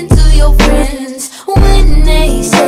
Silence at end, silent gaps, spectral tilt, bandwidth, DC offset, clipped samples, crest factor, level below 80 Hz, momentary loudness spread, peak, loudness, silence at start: 0 s; none; -5 dB/octave; 14 kHz; under 0.1%; 0.9%; 6 dB; -8 dBFS; 11 LU; 0 dBFS; -11 LUFS; 0 s